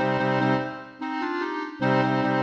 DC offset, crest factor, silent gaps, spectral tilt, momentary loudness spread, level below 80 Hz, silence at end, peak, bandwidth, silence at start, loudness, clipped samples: under 0.1%; 14 dB; none; -7.5 dB/octave; 10 LU; -64 dBFS; 0 s; -10 dBFS; 7.8 kHz; 0 s; -25 LUFS; under 0.1%